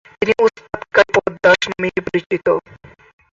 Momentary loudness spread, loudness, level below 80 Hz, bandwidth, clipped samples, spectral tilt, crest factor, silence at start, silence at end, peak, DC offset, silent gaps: 8 LU; -16 LUFS; -50 dBFS; 7.8 kHz; under 0.1%; -4.5 dB/octave; 18 dB; 0.2 s; 0.7 s; 0 dBFS; under 0.1%; 2.26-2.30 s